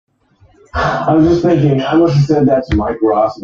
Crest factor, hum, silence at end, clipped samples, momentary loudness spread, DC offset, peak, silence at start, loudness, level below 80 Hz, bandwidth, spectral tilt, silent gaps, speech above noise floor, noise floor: 12 dB; none; 0 s; under 0.1%; 6 LU; under 0.1%; -2 dBFS; 0.75 s; -12 LUFS; -34 dBFS; 7.4 kHz; -8 dB/octave; none; 39 dB; -50 dBFS